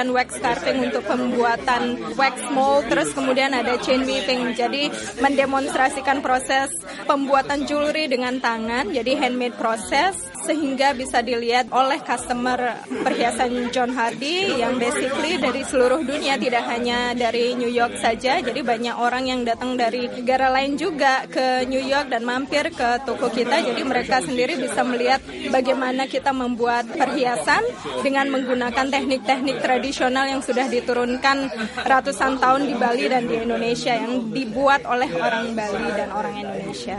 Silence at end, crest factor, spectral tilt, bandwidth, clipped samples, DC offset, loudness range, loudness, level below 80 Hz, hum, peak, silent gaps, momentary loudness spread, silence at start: 0 s; 18 dB; -3.5 dB/octave; 11.5 kHz; under 0.1%; under 0.1%; 1 LU; -21 LUFS; -52 dBFS; none; -4 dBFS; none; 5 LU; 0 s